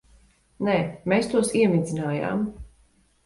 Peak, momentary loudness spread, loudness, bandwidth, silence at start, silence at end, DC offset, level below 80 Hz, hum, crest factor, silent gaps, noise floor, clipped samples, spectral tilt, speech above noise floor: -8 dBFS; 8 LU; -24 LUFS; 11.5 kHz; 0.6 s; 0.6 s; under 0.1%; -52 dBFS; none; 18 dB; none; -61 dBFS; under 0.1%; -6 dB/octave; 38 dB